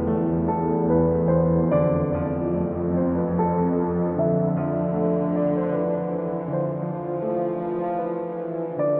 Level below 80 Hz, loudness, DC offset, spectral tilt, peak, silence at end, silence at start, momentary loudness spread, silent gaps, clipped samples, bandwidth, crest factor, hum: -46 dBFS; -23 LUFS; under 0.1%; -13.5 dB/octave; -8 dBFS; 0 s; 0 s; 7 LU; none; under 0.1%; 3.1 kHz; 14 dB; none